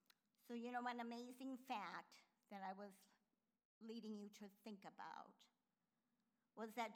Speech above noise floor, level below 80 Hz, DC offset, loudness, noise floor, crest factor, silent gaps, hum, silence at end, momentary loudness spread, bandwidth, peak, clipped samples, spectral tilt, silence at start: over 37 dB; under -90 dBFS; under 0.1%; -54 LUFS; under -90 dBFS; 20 dB; 3.65-3.81 s; none; 0 s; 13 LU; over 20 kHz; -34 dBFS; under 0.1%; -4.5 dB/octave; 0.45 s